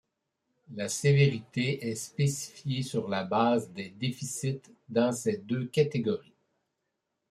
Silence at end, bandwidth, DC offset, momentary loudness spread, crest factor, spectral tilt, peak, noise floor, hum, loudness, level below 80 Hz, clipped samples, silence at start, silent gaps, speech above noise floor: 1.1 s; 14 kHz; under 0.1%; 10 LU; 20 dB; -5.5 dB/octave; -12 dBFS; -83 dBFS; none; -30 LUFS; -68 dBFS; under 0.1%; 0.7 s; none; 53 dB